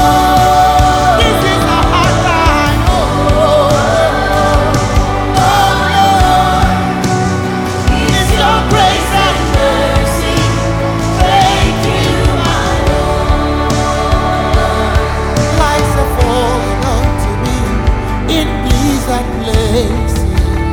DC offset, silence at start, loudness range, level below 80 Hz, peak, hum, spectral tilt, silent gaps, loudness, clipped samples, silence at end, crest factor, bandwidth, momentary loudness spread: under 0.1%; 0 s; 3 LU; -18 dBFS; 0 dBFS; none; -5 dB/octave; none; -11 LUFS; under 0.1%; 0 s; 10 dB; 18 kHz; 5 LU